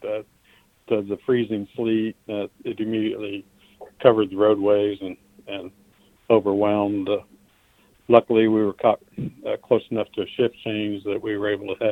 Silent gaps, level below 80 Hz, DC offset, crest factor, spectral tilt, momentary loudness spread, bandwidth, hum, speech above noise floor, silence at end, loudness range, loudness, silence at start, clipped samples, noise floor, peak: none; -62 dBFS; under 0.1%; 22 dB; -8 dB/octave; 15 LU; 4.2 kHz; none; 37 dB; 0 s; 5 LU; -23 LUFS; 0 s; under 0.1%; -59 dBFS; 0 dBFS